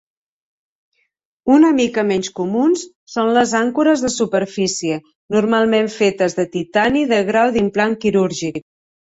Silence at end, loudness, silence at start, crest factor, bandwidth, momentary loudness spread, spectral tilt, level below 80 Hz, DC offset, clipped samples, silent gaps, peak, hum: 0.6 s; -17 LUFS; 1.45 s; 16 dB; 8.2 kHz; 8 LU; -4.5 dB/octave; -54 dBFS; under 0.1%; under 0.1%; 2.96-3.07 s, 5.15-5.29 s; -2 dBFS; none